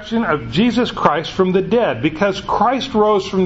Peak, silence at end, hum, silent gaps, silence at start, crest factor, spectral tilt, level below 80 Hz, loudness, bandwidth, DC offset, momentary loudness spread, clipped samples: 0 dBFS; 0 s; none; none; 0 s; 16 dB; -6 dB/octave; -42 dBFS; -17 LUFS; 8 kHz; under 0.1%; 3 LU; under 0.1%